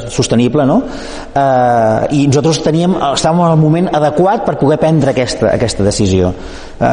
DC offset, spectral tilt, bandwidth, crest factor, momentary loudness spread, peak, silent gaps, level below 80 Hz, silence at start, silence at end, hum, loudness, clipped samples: under 0.1%; -6 dB/octave; 10 kHz; 10 dB; 6 LU; 0 dBFS; none; -34 dBFS; 0 s; 0 s; none; -12 LUFS; under 0.1%